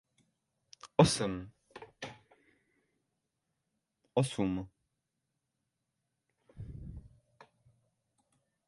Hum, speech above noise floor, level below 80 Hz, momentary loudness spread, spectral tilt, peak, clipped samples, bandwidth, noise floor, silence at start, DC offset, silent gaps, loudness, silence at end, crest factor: none; 55 dB; -60 dBFS; 26 LU; -5.5 dB/octave; -8 dBFS; under 0.1%; 11.5 kHz; -85 dBFS; 0.85 s; under 0.1%; none; -32 LUFS; 1.6 s; 30 dB